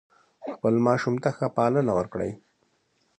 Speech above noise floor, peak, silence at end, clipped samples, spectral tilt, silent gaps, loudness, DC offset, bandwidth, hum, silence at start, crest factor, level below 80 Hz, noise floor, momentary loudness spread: 45 dB; -8 dBFS; 0.8 s; under 0.1%; -8 dB/octave; none; -25 LUFS; under 0.1%; 10 kHz; none; 0.4 s; 20 dB; -58 dBFS; -70 dBFS; 15 LU